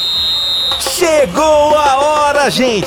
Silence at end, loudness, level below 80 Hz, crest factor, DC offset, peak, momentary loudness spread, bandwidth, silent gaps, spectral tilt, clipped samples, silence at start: 0 s; -11 LUFS; -38 dBFS; 12 dB; under 0.1%; 0 dBFS; 3 LU; 19 kHz; none; -2.5 dB/octave; under 0.1%; 0 s